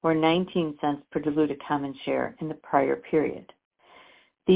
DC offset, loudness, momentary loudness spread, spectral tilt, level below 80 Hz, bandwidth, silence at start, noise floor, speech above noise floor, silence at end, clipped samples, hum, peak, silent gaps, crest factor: under 0.1%; -27 LUFS; 9 LU; -10.5 dB/octave; -62 dBFS; 4 kHz; 0.05 s; -55 dBFS; 29 dB; 0 s; under 0.1%; none; -6 dBFS; 3.65-3.71 s; 20 dB